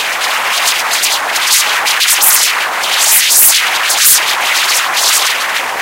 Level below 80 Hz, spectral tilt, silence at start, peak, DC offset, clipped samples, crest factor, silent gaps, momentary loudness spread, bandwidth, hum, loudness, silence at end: -56 dBFS; 3.5 dB/octave; 0 s; 0 dBFS; under 0.1%; 0.5%; 12 dB; none; 7 LU; over 20 kHz; none; -8 LUFS; 0 s